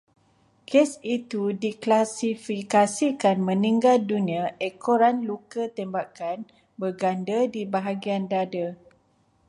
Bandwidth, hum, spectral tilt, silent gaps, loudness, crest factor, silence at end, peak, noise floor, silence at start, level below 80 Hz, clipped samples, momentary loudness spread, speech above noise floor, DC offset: 11.5 kHz; none; -5.5 dB/octave; none; -25 LUFS; 18 dB; 0.75 s; -8 dBFS; -65 dBFS; 0.7 s; -74 dBFS; under 0.1%; 11 LU; 40 dB; under 0.1%